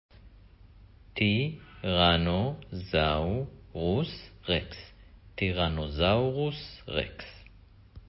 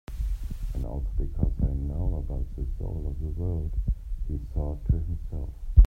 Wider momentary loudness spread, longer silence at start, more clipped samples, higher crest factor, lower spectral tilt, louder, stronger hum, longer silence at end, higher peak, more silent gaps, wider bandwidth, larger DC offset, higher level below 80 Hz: first, 16 LU vs 6 LU; first, 0.25 s vs 0.1 s; neither; about the same, 20 dB vs 22 dB; about the same, -10 dB/octave vs -10 dB/octave; first, -29 LUFS vs -32 LUFS; neither; about the same, 0.1 s vs 0 s; second, -10 dBFS vs -4 dBFS; neither; first, 5.8 kHz vs 1.9 kHz; neither; second, -42 dBFS vs -28 dBFS